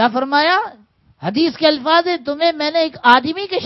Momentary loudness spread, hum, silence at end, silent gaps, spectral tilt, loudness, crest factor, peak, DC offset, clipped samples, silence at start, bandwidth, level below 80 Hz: 9 LU; none; 0 s; none; -5.5 dB/octave; -15 LUFS; 16 dB; 0 dBFS; under 0.1%; under 0.1%; 0 s; 6.6 kHz; -62 dBFS